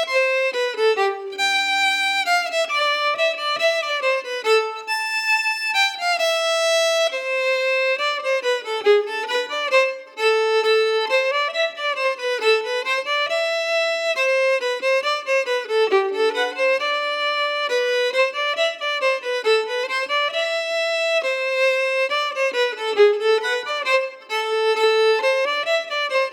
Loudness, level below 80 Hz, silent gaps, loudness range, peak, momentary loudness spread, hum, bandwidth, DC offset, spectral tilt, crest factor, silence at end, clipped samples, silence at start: -20 LUFS; under -90 dBFS; none; 1 LU; -4 dBFS; 4 LU; none; 17.5 kHz; under 0.1%; 1.5 dB/octave; 16 dB; 0 s; under 0.1%; 0 s